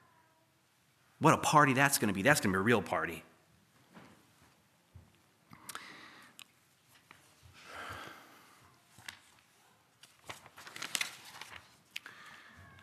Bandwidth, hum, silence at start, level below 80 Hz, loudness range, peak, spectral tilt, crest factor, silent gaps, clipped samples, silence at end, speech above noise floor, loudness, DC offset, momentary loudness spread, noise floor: 15 kHz; none; 1.2 s; -72 dBFS; 24 LU; -8 dBFS; -4 dB/octave; 28 dB; none; under 0.1%; 0.45 s; 42 dB; -30 LUFS; under 0.1%; 27 LU; -71 dBFS